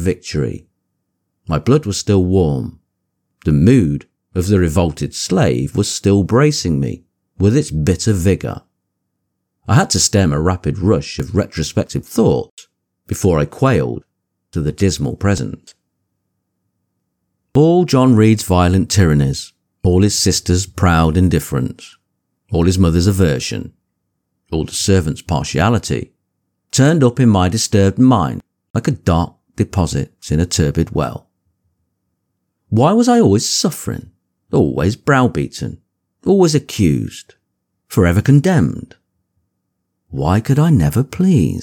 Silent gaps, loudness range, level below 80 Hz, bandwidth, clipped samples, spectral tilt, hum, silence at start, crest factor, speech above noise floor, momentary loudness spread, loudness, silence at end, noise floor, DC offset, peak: 12.51-12.57 s, 28.70-28.74 s; 5 LU; -34 dBFS; 18.5 kHz; under 0.1%; -6 dB/octave; none; 0 s; 14 dB; 59 dB; 13 LU; -15 LUFS; 0 s; -73 dBFS; under 0.1%; 0 dBFS